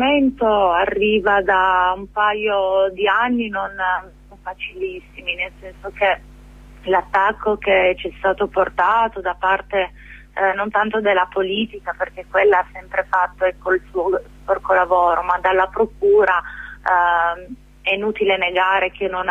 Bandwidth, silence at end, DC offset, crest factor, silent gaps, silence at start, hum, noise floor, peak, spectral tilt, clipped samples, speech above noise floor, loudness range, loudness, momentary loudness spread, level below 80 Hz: 7.4 kHz; 0 s; under 0.1%; 14 dB; none; 0 s; none; -41 dBFS; -4 dBFS; -6 dB/octave; under 0.1%; 23 dB; 5 LU; -18 LUFS; 11 LU; -44 dBFS